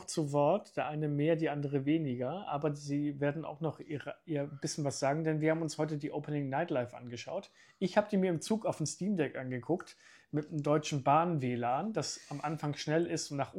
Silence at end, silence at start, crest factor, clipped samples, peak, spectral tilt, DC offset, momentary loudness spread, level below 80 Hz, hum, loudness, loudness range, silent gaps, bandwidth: 0 s; 0 s; 20 dB; under 0.1%; -14 dBFS; -6 dB/octave; under 0.1%; 9 LU; -76 dBFS; none; -34 LUFS; 2 LU; none; 12.5 kHz